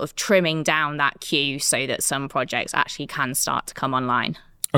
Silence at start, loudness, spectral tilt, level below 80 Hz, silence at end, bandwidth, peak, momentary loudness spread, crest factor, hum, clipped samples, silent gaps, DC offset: 0 s; -22 LUFS; -3 dB/octave; -56 dBFS; 0 s; 19 kHz; -2 dBFS; 6 LU; 22 dB; none; under 0.1%; none; under 0.1%